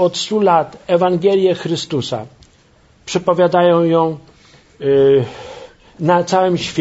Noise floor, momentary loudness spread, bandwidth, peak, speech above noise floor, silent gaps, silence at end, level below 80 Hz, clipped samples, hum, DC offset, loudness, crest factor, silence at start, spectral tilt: -51 dBFS; 13 LU; 8 kHz; 0 dBFS; 36 dB; none; 0 s; -54 dBFS; under 0.1%; none; under 0.1%; -15 LUFS; 16 dB; 0 s; -6 dB/octave